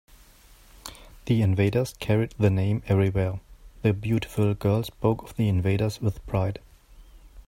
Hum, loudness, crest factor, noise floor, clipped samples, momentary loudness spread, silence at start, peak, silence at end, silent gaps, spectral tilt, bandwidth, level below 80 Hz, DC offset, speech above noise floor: none; -25 LUFS; 18 dB; -53 dBFS; under 0.1%; 17 LU; 0.85 s; -8 dBFS; 0.05 s; none; -7.5 dB/octave; 16 kHz; -46 dBFS; under 0.1%; 29 dB